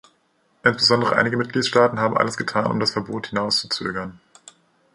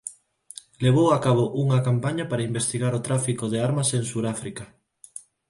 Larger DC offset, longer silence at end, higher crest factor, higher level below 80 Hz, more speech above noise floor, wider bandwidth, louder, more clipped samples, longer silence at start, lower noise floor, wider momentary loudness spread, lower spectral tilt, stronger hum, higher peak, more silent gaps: neither; first, 0.8 s vs 0.3 s; about the same, 20 dB vs 16 dB; about the same, -58 dBFS vs -58 dBFS; first, 43 dB vs 25 dB; about the same, 11.5 kHz vs 11.5 kHz; first, -20 LUFS vs -23 LUFS; neither; first, 0.65 s vs 0.05 s; first, -64 dBFS vs -48 dBFS; second, 10 LU vs 22 LU; second, -4 dB/octave vs -5.5 dB/octave; neither; first, -2 dBFS vs -8 dBFS; neither